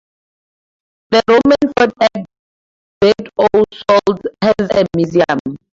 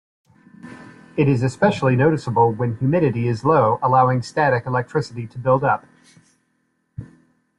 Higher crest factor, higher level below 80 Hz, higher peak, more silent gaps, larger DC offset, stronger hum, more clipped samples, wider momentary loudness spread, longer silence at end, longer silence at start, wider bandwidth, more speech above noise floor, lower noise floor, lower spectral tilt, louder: about the same, 14 dB vs 16 dB; first, -48 dBFS vs -54 dBFS; first, 0 dBFS vs -4 dBFS; first, 2.39-3.01 s, 5.40-5.45 s vs none; neither; neither; neither; second, 6 LU vs 18 LU; second, 0.25 s vs 0.55 s; first, 1.1 s vs 0.65 s; second, 7.8 kHz vs 10.5 kHz; first, over 77 dB vs 50 dB; first, under -90 dBFS vs -68 dBFS; second, -6 dB/octave vs -8 dB/octave; first, -13 LUFS vs -19 LUFS